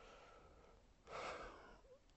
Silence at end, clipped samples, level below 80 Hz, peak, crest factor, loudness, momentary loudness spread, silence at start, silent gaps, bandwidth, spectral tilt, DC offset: 0 s; under 0.1%; -70 dBFS; -36 dBFS; 20 dB; -55 LUFS; 18 LU; 0 s; none; 8.2 kHz; -3.5 dB/octave; under 0.1%